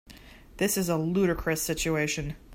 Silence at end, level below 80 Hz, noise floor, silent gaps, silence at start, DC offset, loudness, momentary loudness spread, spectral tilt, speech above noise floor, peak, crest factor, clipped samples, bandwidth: 0 s; -46 dBFS; -49 dBFS; none; 0.1 s; under 0.1%; -28 LUFS; 4 LU; -4.5 dB/octave; 22 dB; -14 dBFS; 16 dB; under 0.1%; 16.5 kHz